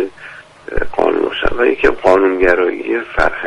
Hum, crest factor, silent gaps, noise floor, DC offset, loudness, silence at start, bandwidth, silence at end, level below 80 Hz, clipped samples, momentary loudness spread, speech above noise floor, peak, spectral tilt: none; 14 dB; none; -36 dBFS; under 0.1%; -15 LUFS; 0 s; 10.5 kHz; 0 s; -30 dBFS; under 0.1%; 14 LU; 23 dB; 0 dBFS; -5.5 dB/octave